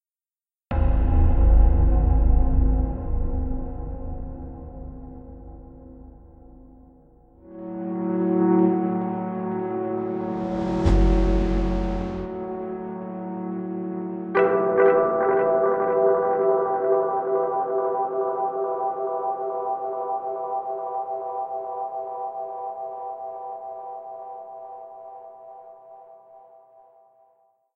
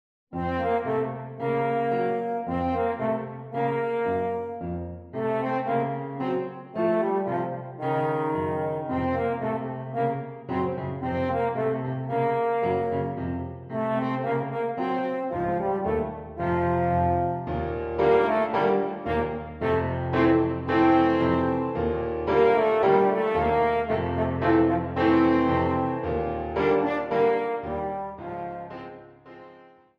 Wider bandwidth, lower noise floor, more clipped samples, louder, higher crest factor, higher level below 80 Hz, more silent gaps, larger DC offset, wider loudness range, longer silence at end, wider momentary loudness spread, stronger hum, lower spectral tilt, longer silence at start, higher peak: about the same, 5.6 kHz vs 6 kHz; first, under -90 dBFS vs -52 dBFS; neither; about the same, -24 LUFS vs -26 LUFS; about the same, 18 dB vs 16 dB; first, -28 dBFS vs -48 dBFS; neither; neither; first, 18 LU vs 6 LU; first, 1.4 s vs 0.35 s; first, 20 LU vs 11 LU; neither; about the same, -9.5 dB/octave vs -9 dB/octave; first, 0.7 s vs 0.3 s; about the same, -6 dBFS vs -8 dBFS